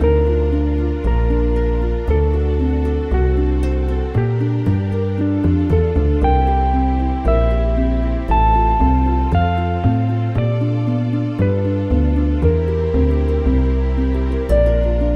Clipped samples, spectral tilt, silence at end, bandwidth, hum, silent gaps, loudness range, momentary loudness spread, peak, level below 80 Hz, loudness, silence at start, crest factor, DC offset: under 0.1%; -10 dB/octave; 0 s; 5 kHz; none; none; 2 LU; 4 LU; -4 dBFS; -18 dBFS; -17 LUFS; 0 s; 12 dB; under 0.1%